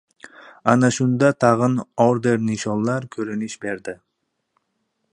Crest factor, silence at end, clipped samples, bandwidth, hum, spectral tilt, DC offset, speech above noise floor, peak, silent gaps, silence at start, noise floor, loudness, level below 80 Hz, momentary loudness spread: 20 dB; 1.2 s; under 0.1%; 10.5 kHz; none; -6 dB/octave; under 0.1%; 54 dB; 0 dBFS; none; 0.25 s; -73 dBFS; -20 LUFS; -60 dBFS; 12 LU